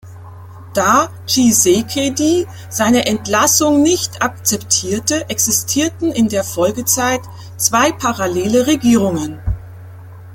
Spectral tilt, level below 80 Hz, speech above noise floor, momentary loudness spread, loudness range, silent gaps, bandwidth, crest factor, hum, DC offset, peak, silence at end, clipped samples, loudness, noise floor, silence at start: -3 dB/octave; -38 dBFS; 19 dB; 8 LU; 2 LU; none; 17 kHz; 16 dB; none; under 0.1%; 0 dBFS; 0 s; under 0.1%; -15 LUFS; -34 dBFS; 0.05 s